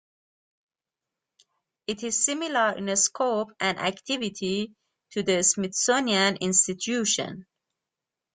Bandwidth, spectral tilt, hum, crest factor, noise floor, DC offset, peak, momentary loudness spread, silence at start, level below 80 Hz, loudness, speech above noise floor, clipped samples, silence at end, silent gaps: 10 kHz; -2 dB/octave; none; 22 dB; -89 dBFS; under 0.1%; -6 dBFS; 11 LU; 1.9 s; -68 dBFS; -25 LUFS; 63 dB; under 0.1%; 0.95 s; none